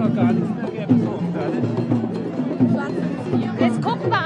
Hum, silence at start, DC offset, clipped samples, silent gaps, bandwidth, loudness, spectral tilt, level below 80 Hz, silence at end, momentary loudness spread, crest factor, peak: none; 0 s; under 0.1%; under 0.1%; none; 9.8 kHz; -21 LUFS; -8.5 dB/octave; -60 dBFS; 0 s; 6 LU; 16 dB; -6 dBFS